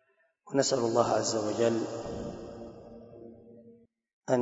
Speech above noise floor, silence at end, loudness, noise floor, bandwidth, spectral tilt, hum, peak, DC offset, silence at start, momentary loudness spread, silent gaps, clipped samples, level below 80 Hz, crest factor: 32 dB; 0 s; -30 LUFS; -60 dBFS; 8 kHz; -4.5 dB/octave; none; -10 dBFS; under 0.1%; 0.45 s; 23 LU; 4.13-4.21 s; under 0.1%; -60 dBFS; 22 dB